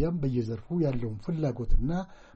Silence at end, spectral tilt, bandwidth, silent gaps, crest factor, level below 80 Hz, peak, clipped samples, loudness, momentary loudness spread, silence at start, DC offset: 0.2 s; -9.5 dB/octave; 6.8 kHz; none; 16 dB; -32 dBFS; -12 dBFS; under 0.1%; -31 LUFS; 5 LU; 0 s; under 0.1%